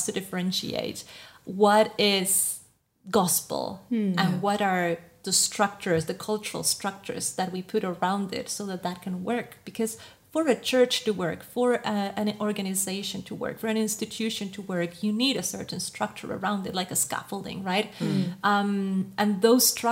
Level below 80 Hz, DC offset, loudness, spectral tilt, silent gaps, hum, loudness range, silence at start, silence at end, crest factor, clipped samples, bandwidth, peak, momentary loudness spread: -68 dBFS; under 0.1%; -26 LUFS; -3.5 dB/octave; none; none; 5 LU; 0 s; 0 s; 20 dB; under 0.1%; 16 kHz; -8 dBFS; 11 LU